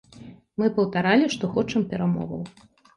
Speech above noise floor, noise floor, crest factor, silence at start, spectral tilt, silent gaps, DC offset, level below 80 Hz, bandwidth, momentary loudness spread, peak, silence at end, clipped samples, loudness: 23 dB; -46 dBFS; 18 dB; 0.15 s; -6.5 dB/octave; none; under 0.1%; -58 dBFS; 11 kHz; 15 LU; -6 dBFS; 0.45 s; under 0.1%; -24 LUFS